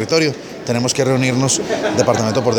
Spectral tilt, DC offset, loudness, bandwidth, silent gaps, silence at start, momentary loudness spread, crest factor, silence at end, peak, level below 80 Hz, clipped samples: -4.5 dB/octave; under 0.1%; -16 LUFS; 18 kHz; none; 0 s; 5 LU; 16 dB; 0 s; 0 dBFS; -52 dBFS; under 0.1%